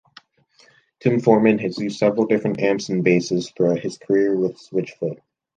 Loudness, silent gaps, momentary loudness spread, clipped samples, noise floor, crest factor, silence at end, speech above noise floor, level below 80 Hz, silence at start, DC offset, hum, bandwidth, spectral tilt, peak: -20 LUFS; none; 10 LU; under 0.1%; -57 dBFS; 18 dB; 0.4 s; 37 dB; -64 dBFS; 1.05 s; under 0.1%; none; 9.2 kHz; -6.5 dB/octave; -2 dBFS